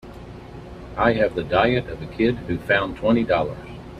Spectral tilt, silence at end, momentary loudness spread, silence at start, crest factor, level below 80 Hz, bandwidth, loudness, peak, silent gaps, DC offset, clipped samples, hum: -7.5 dB/octave; 0 s; 20 LU; 0.05 s; 20 dB; -42 dBFS; 10.5 kHz; -21 LUFS; -4 dBFS; none; under 0.1%; under 0.1%; none